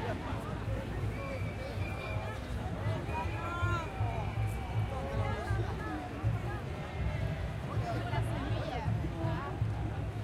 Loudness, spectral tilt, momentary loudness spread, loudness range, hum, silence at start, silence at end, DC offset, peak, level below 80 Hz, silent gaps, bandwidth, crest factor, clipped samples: -36 LUFS; -7 dB/octave; 4 LU; 1 LU; none; 0 s; 0 s; under 0.1%; -20 dBFS; -44 dBFS; none; 13 kHz; 14 dB; under 0.1%